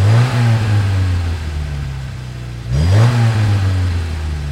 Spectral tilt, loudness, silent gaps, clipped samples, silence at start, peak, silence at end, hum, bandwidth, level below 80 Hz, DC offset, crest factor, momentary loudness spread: -6.5 dB/octave; -16 LUFS; none; under 0.1%; 0 s; 0 dBFS; 0 s; none; 11.5 kHz; -26 dBFS; under 0.1%; 14 dB; 14 LU